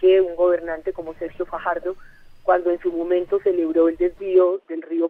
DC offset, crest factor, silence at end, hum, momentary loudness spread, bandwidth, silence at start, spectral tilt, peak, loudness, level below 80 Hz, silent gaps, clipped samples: under 0.1%; 16 dB; 0 s; none; 12 LU; 3.8 kHz; 0 s; -7.5 dB/octave; -6 dBFS; -21 LUFS; -50 dBFS; none; under 0.1%